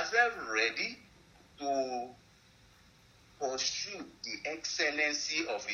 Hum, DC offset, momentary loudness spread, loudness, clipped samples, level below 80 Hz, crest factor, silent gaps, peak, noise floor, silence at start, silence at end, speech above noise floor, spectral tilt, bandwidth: none; under 0.1%; 12 LU; -33 LUFS; under 0.1%; -70 dBFS; 22 dB; none; -14 dBFS; -62 dBFS; 0 s; 0 s; 27 dB; -0.5 dB/octave; 12.5 kHz